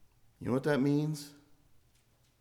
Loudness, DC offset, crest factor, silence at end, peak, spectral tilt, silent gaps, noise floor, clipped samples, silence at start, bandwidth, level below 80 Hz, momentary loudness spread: -32 LUFS; under 0.1%; 20 dB; 1.1 s; -16 dBFS; -7 dB/octave; none; -69 dBFS; under 0.1%; 0.4 s; 15.5 kHz; -70 dBFS; 14 LU